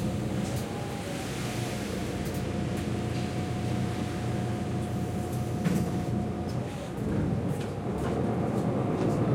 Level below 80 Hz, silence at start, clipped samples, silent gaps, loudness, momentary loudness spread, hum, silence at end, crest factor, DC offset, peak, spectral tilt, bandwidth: -48 dBFS; 0 s; under 0.1%; none; -31 LUFS; 5 LU; none; 0 s; 16 dB; under 0.1%; -14 dBFS; -6.5 dB/octave; 16.5 kHz